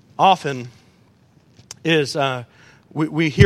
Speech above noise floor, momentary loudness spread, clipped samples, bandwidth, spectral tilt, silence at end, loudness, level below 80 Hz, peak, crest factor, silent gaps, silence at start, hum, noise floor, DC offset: 37 dB; 17 LU; under 0.1%; 14 kHz; -6 dB/octave; 0 s; -20 LUFS; -50 dBFS; 0 dBFS; 20 dB; none; 0.2 s; none; -54 dBFS; under 0.1%